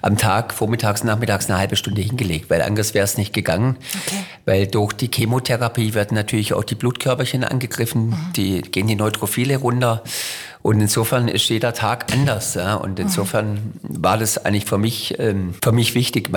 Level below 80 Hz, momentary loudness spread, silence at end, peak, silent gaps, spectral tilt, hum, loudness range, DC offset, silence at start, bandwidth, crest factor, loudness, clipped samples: -50 dBFS; 5 LU; 0 s; -6 dBFS; none; -4.5 dB/octave; none; 1 LU; under 0.1%; 0.05 s; 19.5 kHz; 14 dB; -19 LUFS; under 0.1%